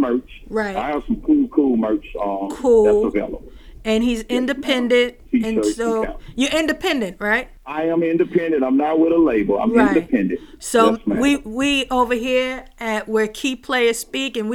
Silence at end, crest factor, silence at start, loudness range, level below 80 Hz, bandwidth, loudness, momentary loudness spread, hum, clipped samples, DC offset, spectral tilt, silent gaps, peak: 0 s; 18 dB; 0 s; 3 LU; -42 dBFS; 17 kHz; -19 LUFS; 9 LU; none; under 0.1%; under 0.1%; -4.5 dB/octave; none; -2 dBFS